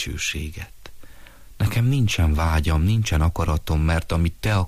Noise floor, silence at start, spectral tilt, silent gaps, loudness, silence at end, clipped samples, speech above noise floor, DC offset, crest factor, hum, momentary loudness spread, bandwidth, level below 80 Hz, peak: -42 dBFS; 0 s; -5.5 dB/octave; none; -22 LUFS; 0 s; under 0.1%; 21 dB; under 0.1%; 12 dB; none; 8 LU; 15.5 kHz; -28 dBFS; -10 dBFS